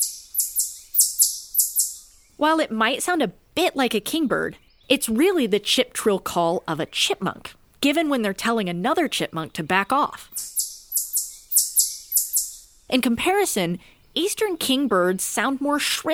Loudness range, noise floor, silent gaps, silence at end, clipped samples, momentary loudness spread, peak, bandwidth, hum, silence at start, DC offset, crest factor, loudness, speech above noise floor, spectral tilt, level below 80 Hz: 2 LU; -43 dBFS; none; 0 s; under 0.1%; 8 LU; 0 dBFS; over 20 kHz; none; 0 s; under 0.1%; 22 dB; -22 LUFS; 21 dB; -2.5 dB/octave; -58 dBFS